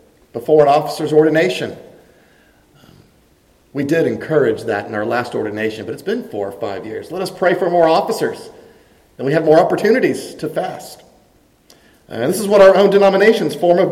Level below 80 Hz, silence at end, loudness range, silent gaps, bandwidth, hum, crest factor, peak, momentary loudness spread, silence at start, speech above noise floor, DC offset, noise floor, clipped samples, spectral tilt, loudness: -56 dBFS; 0 s; 6 LU; none; 16 kHz; none; 16 dB; 0 dBFS; 15 LU; 0.35 s; 39 dB; under 0.1%; -53 dBFS; under 0.1%; -5.5 dB/octave; -15 LUFS